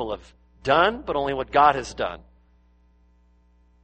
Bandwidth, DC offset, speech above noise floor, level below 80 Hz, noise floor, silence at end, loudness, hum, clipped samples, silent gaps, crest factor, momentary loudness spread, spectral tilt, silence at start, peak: 8.4 kHz; under 0.1%; 36 dB; -48 dBFS; -59 dBFS; 1.65 s; -22 LUFS; 60 Hz at -50 dBFS; under 0.1%; none; 20 dB; 14 LU; -4.5 dB/octave; 0 s; -4 dBFS